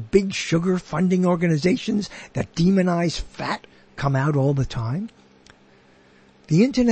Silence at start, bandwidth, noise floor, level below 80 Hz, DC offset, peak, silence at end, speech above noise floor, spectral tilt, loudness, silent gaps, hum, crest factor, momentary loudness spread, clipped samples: 0 s; 8.8 kHz; -54 dBFS; -44 dBFS; under 0.1%; -4 dBFS; 0 s; 33 dB; -6.5 dB/octave; -22 LUFS; none; none; 18 dB; 10 LU; under 0.1%